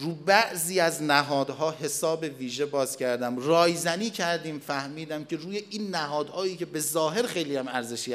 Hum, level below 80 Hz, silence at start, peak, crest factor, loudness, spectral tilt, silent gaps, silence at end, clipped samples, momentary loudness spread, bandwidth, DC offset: none; -82 dBFS; 0 s; -4 dBFS; 24 dB; -27 LUFS; -3.5 dB/octave; none; 0 s; under 0.1%; 11 LU; 15.5 kHz; under 0.1%